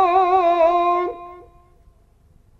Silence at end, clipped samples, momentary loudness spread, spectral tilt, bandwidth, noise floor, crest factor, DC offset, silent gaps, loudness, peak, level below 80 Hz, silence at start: 1.2 s; under 0.1%; 19 LU; -5.5 dB/octave; 6.8 kHz; -54 dBFS; 16 dB; under 0.1%; none; -17 LUFS; -4 dBFS; -52 dBFS; 0 s